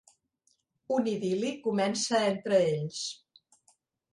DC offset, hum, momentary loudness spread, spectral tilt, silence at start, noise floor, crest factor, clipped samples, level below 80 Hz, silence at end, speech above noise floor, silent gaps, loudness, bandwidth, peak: under 0.1%; none; 10 LU; -4.5 dB/octave; 0.9 s; -74 dBFS; 18 dB; under 0.1%; -74 dBFS; 1 s; 45 dB; none; -29 LUFS; 11.5 kHz; -14 dBFS